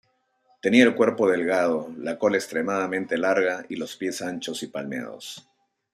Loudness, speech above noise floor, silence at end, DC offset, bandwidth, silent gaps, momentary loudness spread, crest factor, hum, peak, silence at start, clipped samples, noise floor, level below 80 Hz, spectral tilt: -24 LUFS; 42 dB; 0.55 s; under 0.1%; 15 kHz; none; 15 LU; 20 dB; none; -4 dBFS; 0.65 s; under 0.1%; -66 dBFS; -70 dBFS; -4.5 dB/octave